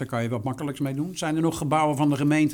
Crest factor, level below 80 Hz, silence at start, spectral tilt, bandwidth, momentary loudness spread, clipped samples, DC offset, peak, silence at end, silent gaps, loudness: 14 dB; -56 dBFS; 0 s; -6 dB/octave; 18.5 kHz; 7 LU; under 0.1%; under 0.1%; -10 dBFS; 0 s; none; -25 LUFS